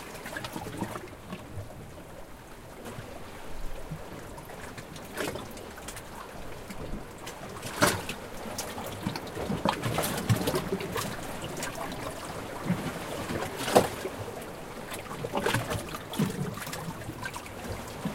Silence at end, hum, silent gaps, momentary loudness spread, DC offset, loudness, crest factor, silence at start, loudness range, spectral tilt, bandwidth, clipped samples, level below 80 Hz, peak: 0 s; none; none; 15 LU; under 0.1%; -34 LUFS; 28 dB; 0 s; 11 LU; -4.5 dB/octave; 17 kHz; under 0.1%; -48 dBFS; -4 dBFS